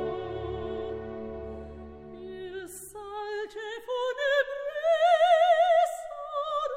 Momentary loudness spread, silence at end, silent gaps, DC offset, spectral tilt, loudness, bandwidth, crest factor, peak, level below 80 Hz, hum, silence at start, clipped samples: 20 LU; 0 s; none; under 0.1%; -4 dB/octave; -27 LUFS; 15.5 kHz; 16 dB; -12 dBFS; -54 dBFS; none; 0 s; under 0.1%